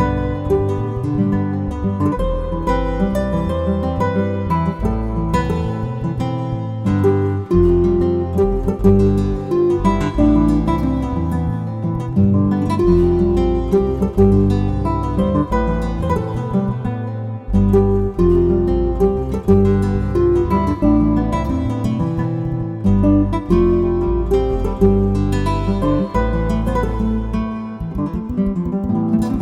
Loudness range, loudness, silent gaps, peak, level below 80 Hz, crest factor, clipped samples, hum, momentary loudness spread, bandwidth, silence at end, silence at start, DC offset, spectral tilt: 4 LU; -18 LUFS; none; 0 dBFS; -24 dBFS; 16 dB; under 0.1%; none; 7 LU; 12 kHz; 0 s; 0 s; under 0.1%; -9 dB/octave